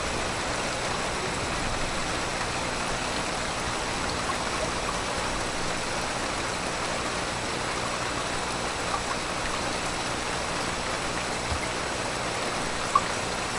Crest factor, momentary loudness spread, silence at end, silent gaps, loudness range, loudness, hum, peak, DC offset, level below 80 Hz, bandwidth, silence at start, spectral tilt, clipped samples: 22 dB; 1 LU; 0 s; none; 1 LU; -28 LUFS; 60 Hz at -45 dBFS; -8 dBFS; under 0.1%; -42 dBFS; 11.5 kHz; 0 s; -2.5 dB/octave; under 0.1%